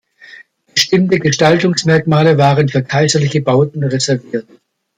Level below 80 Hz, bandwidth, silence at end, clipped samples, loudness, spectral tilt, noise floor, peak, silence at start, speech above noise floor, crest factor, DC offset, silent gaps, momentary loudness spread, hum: -52 dBFS; 15 kHz; 0.55 s; under 0.1%; -13 LUFS; -5 dB/octave; -41 dBFS; 0 dBFS; 0.35 s; 28 dB; 14 dB; under 0.1%; none; 6 LU; none